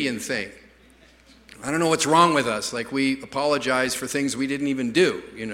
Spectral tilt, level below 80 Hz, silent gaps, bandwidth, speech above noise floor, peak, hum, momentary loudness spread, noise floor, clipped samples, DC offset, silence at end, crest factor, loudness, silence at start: -3.5 dB/octave; -58 dBFS; none; 16 kHz; 30 dB; -2 dBFS; none; 11 LU; -53 dBFS; under 0.1%; under 0.1%; 0 s; 22 dB; -23 LUFS; 0 s